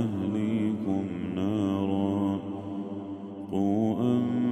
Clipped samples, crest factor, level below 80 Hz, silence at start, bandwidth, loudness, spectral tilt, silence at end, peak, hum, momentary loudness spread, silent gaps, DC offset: under 0.1%; 14 dB; -66 dBFS; 0 s; 8.8 kHz; -29 LUFS; -8.5 dB/octave; 0 s; -14 dBFS; none; 9 LU; none; under 0.1%